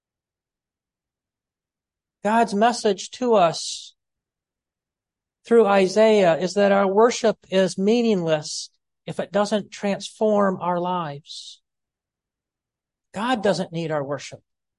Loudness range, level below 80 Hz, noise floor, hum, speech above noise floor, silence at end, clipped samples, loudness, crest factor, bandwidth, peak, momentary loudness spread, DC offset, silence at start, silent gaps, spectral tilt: 9 LU; -70 dBFS; -90 dBFS; none; 69 dB; 0.4 s; under 0.1%; -21 LUFS; 18 dB; 11.5 kHz; -6 dBFS; 16 LU; under 0.1%; 2.25 s; none; -5 dB/octave